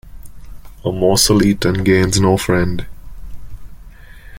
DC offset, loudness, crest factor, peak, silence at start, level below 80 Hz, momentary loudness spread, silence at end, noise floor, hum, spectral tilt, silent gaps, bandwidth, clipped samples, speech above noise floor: under 0.1%; -14 LUFS; 16 dB; 0 dBFS; 0.05 s; -34 dBFS; 13 LU; 0 s; -37 dBFS; none; -4.5 dB/octave; none; 17 kHz; under 0.1%; 23 dB